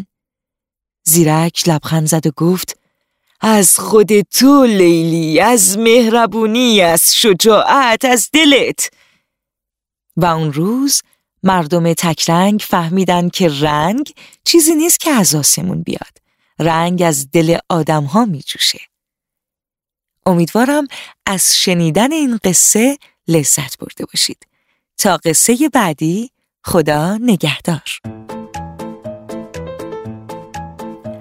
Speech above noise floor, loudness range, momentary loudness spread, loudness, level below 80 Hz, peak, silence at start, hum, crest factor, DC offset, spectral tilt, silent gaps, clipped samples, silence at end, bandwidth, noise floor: 76 dB; 8 LU; 19 LU; -12 LUFS; -48 dBFS; 0 dBFS; 0 s; none; 14 dB; under 0.1%; -3.5 dB/octave; none; under 0.1%; 0 s; 16.5 kHz; -88 dBFS